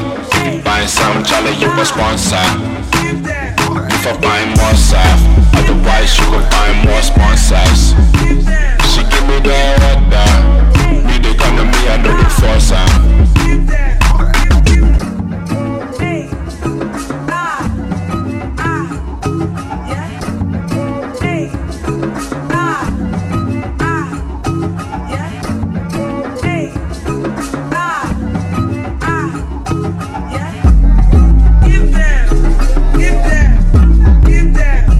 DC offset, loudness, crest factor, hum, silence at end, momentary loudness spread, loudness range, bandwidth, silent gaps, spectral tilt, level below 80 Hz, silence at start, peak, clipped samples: under 0.1%; -13 LUFS; 10 dB; none; 0 s; 11 LU; 8 LU; 14.5 kHz; none; -5 dB/octave; -12 dBFS; 0 s; 0 dBFS; under 0.1%